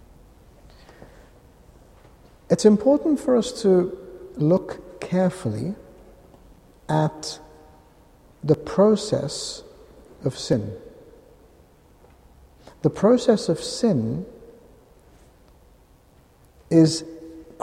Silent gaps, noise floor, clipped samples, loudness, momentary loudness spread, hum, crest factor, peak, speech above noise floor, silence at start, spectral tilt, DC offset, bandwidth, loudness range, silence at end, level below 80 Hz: none; -55 dBFS; under 0.1%; -22 LUFS; 20 LU; none; 20 dB; -4 dBFS; 34 dB; 1 s; -6.5 dB/octave; under 0.1%; 13.5 kHz; 9 LU; 0.2 s; -54 dBFS